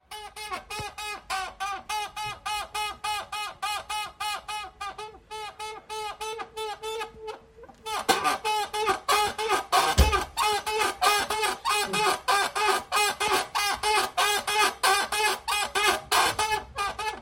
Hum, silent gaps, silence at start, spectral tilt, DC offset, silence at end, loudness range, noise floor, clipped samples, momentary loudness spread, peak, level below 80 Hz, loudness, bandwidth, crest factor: none; none; 0.1 s; -2 dB/octave; under 0.1%; 0 s; 10 LU; -50 dBFS; under 0.1%; 13 LU; -6 dBFS; -42 dBFS; -26 LUFS; 16.5 kHz; 22 dB